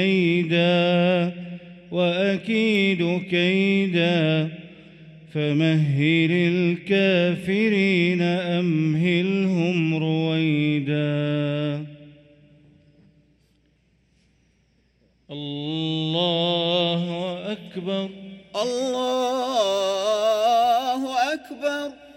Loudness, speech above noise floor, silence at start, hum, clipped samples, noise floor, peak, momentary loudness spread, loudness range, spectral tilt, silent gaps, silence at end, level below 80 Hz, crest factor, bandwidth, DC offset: -22 LUFS; 43 dB; 0 s; none; under 0.1%; -63 dBFS; -8 dBFS; 11 LU; 8 LU; -6.5 dB/octave; none; 0.05 s; -66 dBFS; 14 dB; 14 kHz; under 0.1%